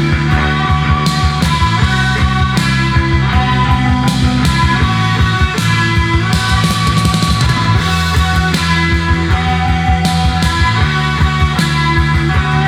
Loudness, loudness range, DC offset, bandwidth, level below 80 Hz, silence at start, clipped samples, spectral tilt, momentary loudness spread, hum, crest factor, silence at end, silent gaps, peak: -12 LUFS; 0 LU; under 0.1%; 15.5 kHz; -20 dBFS; 0 s; under 0.1%; -5 dB/octave; 1 LU; none; 12 dB; 0 s; none; 0 dBFS